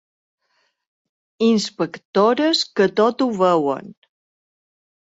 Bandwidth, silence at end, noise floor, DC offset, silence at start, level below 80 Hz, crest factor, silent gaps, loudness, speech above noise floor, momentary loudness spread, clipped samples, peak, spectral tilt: 8 kHz; 1.2 s; -68 dBFS; under 0.1%; 1.4 s; -68 dBFS; 16 dB; 2.05-2.13 s; -19 LUFS; 50 dB; 8 LU; under 0.1%; -4 dBFS; -5 dB/octave